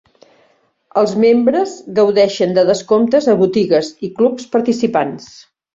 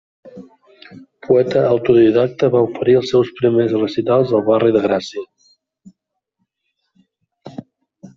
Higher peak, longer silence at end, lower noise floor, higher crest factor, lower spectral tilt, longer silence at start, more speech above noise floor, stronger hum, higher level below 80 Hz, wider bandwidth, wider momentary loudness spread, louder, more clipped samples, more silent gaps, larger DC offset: about the same, -2 dBFS vs -2 dBFS; first, 0.5 s vs 0.1 s; second, -57 dBFS vs -74 dBFS; about the same, 14 dB vs 16 dB; second, -6 dB/octave vs -7.5 dB/octave; first, 0.95 s vs 0.25 s; second, 43 dB vs 59 dB; neither; about the same, -58 dBFS vs -56 dBFS; about the same, 7.8 kHz vs 7.4 kHz; second, 7 LU vs 20 LU; about the same, -14 LUFS vs -15 LUFS; neither; neither; neither